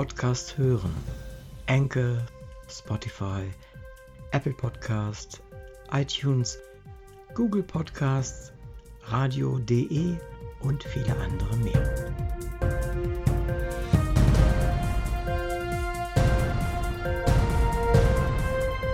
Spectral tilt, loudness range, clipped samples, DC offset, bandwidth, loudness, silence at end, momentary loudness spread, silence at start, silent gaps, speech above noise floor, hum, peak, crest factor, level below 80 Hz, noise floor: -6.5 dB/octave; 5 LU; under 0.1%; under 0.1%; 15.5 kHz; -27 LUFS; 0 s; 18 LU; 0 s; none; 20 dB; none; -10 dBFS; 18 dB; -32 dBFS; -46 dBFS